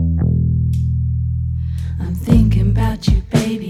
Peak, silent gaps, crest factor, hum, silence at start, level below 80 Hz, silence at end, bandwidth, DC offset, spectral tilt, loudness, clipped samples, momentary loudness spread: 0 dBFS; none; 16 dB; none; 0 s; -22 dBFS; 0 s; 13.5 kHz; under 0.1%; -7.5 dB/octave; -17 LUFS; under 0.1%; 9 LU